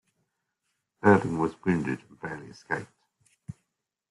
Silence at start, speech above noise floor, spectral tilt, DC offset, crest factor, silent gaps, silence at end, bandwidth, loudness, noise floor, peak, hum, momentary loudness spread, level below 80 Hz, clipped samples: 1.05 s; 55 dB; -8 dB/octave; under 0.1%; 24 dB; none; 0.6 s; 11.5 kHz; -27 LUFS; -82 dBFS; -6 dBFS; none; 25 LU; -64 dBFS; under 0.1%